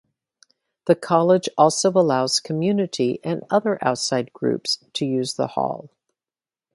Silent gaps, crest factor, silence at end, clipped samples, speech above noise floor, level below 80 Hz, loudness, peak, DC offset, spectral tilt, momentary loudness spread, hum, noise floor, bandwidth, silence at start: none; 20 dB; 0.9 s; under 0.1%; over 69 dB; -68 dBFS; -21 LUFS; -2 dBFS; under 0.1%; -4.5 dB/octave; 7 LU; none; under -90 dBFS; 11.5 kHz; 0.85 s